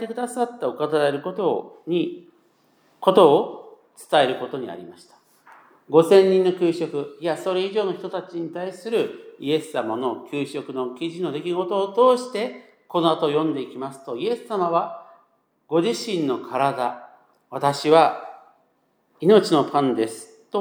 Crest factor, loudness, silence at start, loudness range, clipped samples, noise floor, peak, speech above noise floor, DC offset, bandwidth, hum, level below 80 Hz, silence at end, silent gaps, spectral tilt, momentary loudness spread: 20 dB; -22 LUFS; 0 s; 5 LU; under 0.1%; -66 dBFS; -2 dBFS; 45 dB; under 0.1%; 16.5 kHz; none; -82 dBFS; 0 s; none; -5.5 dB/octave; 15 LU